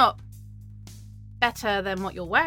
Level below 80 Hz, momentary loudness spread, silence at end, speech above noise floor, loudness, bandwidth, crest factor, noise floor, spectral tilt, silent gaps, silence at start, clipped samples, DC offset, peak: -48 dBFS; 21 LU; 0 s; 18 dB; -26 LUFS; 17.5 kHz; 24 dB; -43 dBFS; -4 dB/octave; none; 0 s; under 0.1%; under 0.1%; -4 dBFS